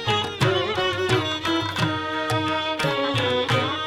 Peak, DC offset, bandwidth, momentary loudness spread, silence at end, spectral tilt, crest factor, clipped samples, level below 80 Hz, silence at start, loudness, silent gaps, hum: -6 dBFS; under 0.1%; 17 kHz; 3 LU; 0 s; -5 dB/octave; 16 dB; under 0.1%; -52 dBFS; 0 s; -23 LUFS; none; none